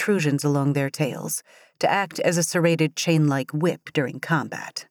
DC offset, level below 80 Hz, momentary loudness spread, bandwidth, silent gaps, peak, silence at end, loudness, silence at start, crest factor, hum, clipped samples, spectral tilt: under 0.1%; -80 dBFS; 7 LU; 19.5 kHz; none; -8 dBFS; 0.05 s; -23 LUFS; 0 s; 16 dB; none; under 0.1%; -5 dB/octave